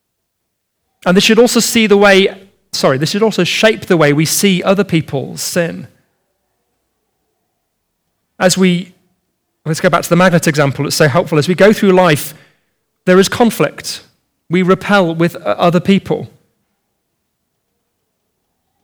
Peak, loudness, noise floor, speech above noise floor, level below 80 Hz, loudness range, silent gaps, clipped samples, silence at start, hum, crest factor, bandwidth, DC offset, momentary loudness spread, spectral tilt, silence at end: 0 dBFS; -12 LUFS; -70 dBFS; 59 dB; -50 dBFS; 8 LU; none; under 0.1%; 1.05 s; none; 14 dB; over 20 kHz; under 0.1%; 12 LU; -4.5 dB/octave; 2.6 s